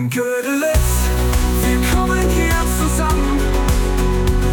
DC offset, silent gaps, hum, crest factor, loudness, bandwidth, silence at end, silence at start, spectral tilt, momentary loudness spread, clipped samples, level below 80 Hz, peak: under 0.1%; none; none; 12 dB; -17 LUFS; 19 kHz; 0 s; 0 s; -5 dB/octave; 2 LU; under 0.1%; -18 dBFS; -4 dBFS